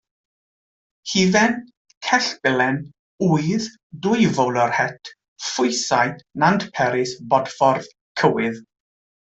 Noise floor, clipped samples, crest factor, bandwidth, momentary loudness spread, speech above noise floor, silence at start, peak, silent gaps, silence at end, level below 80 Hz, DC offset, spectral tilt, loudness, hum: under -90 dBFS; under 0.1%; 18 dB; 8.2 kHz; 12 LU; over 70 dB; 1.05 s; -2 dBFS; 1.77-1.85 s, 1.97-2.01 s, 2.99-3.18 s, 3.83-3.90 s, 5.28-5.36 s, 8.01-8.15 s; 0.75 s; -60 dBFS; under 0.1%; -4.5 dB/octave; -20 LUFS; none